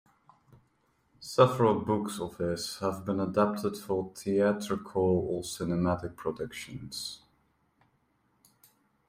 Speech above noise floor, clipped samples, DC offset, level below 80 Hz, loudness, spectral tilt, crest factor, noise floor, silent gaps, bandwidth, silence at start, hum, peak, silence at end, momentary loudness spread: 42 dB; under 0.1%; under 0.1%; -62 dBFS; -30 LUFS; -6 dB/octave; 24 dB; -72 dBFS; none; 16 kHz; 1.2 s; none; -8 dBFS; 1.9 s; 13 LU